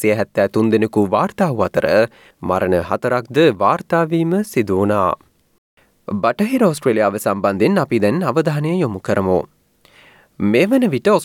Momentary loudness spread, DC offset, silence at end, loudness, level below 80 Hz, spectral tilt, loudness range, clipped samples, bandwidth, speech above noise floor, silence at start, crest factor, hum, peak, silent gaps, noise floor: 5 LU; under 0.1%; 0 s; -17 LUFS; -56 dBFS; -6.5 dB/octave; 2 LU; under 0.1%; 17 kHz; 35 dB; 0 s; 16 dB; none; -2 dBFS; 5.58-5.77 s; -51 dBFS